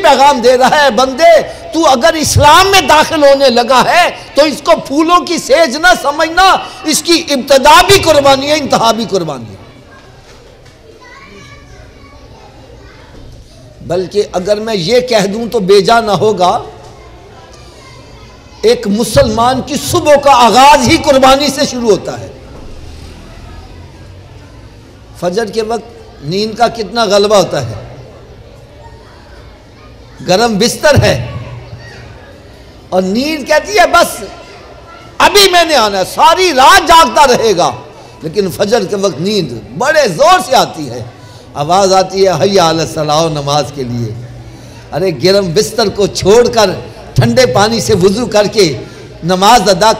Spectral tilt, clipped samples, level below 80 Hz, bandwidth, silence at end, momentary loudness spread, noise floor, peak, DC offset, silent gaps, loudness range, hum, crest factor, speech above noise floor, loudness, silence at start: -3.5 dB/octave; 0.2%; -34 dBFS; 16.5 kHz; 0 s; 14 LU; -37 dBFS; 0 dBFS; under 0.1%; none; 10 LU; none; 10 dB; 28 dB; -9 LUFS; 0 s